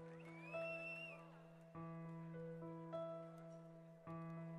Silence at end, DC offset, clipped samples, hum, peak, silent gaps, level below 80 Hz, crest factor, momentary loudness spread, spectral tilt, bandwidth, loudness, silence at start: 0 s; under 0.1%; under 0.1%; none; -36 dBFS; none; -82 dBFS; 16 dB; 12 LU; -7.5 dB/octave; 11 kHz; -53 LUFS; 0 s